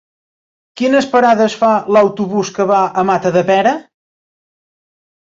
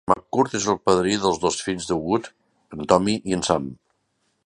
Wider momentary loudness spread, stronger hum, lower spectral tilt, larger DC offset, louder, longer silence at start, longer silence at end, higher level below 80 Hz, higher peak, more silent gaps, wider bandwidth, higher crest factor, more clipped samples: second, 6 LU vs 11 LU; neither; about the same, -5.5 dB/octave vs -4.5 dB/octave; neither; first, -13 LUFS vs -22 LUFS; first, 0.75 s vs 0.05 s; first, 1.55 s vs 0.7 s; second, -58 dBFS vs -50 dBFS; about the same, -2 dBFS vs 0 dBFS; neither; second, 7.8 kHz vs 11 kHz; second, 14 dB vs 22 dB; neither